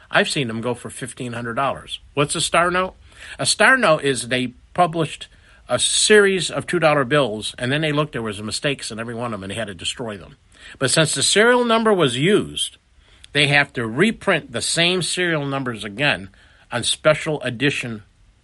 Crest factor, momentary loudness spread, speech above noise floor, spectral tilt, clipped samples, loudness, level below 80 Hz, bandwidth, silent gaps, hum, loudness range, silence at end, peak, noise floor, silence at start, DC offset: 20 dB; 14 LU; 30 dB; -3.5 dB/octave; under 0.1%; -19 LUFS; -52 dBFS; 11.5 kHz; none; none; 5 LU; 0.4 s; 0 dBFS; -50 dBFS; 0.1 s; under 0.1%